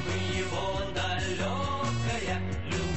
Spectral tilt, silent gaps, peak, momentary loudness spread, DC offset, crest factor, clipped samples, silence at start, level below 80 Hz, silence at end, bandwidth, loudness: -5 dB/octave; none; -18 dBFS; 2 LU; 1%; 12 dB; under 0.1%; 0 s; -40 dBFS; 0 s; 8.6 kHz; -31 LUFS